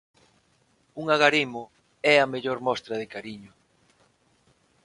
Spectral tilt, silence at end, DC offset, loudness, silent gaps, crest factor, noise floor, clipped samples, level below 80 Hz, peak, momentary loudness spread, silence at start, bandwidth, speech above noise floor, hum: -4 dB/octave; 1.4 s; under 0.1%; -24 LUFS; none; 26 dB; -66 dBFS; under 0.1%; -70 dBFS; -2 dBFS; 20 LU; 0.95 s; 11 kHz; 41 dB; none